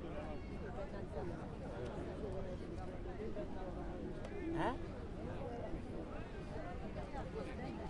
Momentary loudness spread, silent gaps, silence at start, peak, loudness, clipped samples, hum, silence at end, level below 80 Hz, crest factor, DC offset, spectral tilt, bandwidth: 5 LU; none; 0 s; -26 dBFS; -46 LUFS; under 0.1%; none; 0 s; -52 dBFS; 18 dB; under 0.1%; -7.5 dB/octave; 11 kHz